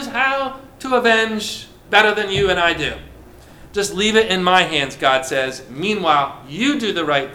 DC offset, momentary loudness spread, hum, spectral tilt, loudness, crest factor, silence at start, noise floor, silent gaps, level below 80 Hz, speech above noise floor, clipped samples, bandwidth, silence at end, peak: under 0.1%; 11 LU; none; -3.5 dB/octave; -17 LUFS; 18 dB; 0 s; -42 dBFS; none; -44 dBFS; 24 dB; under 0.1%; 17 kHz; 0 s; 0 dBFS